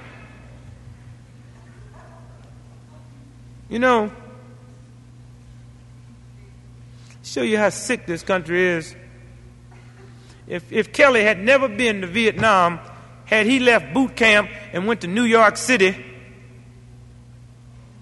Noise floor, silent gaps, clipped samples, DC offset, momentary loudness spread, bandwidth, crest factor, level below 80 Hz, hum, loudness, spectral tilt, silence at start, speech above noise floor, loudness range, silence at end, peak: -44 dBFS; none; under 0.1%; under 0.1%; 17 LU; 11.5 kHz; 22 dB; -50 dBFS; 60 Hz at -45 dBFS; -18 LUFS; -4 dB/octave; 0 s; 26 dB; 9 LU; 0.2 s; 0 dBFS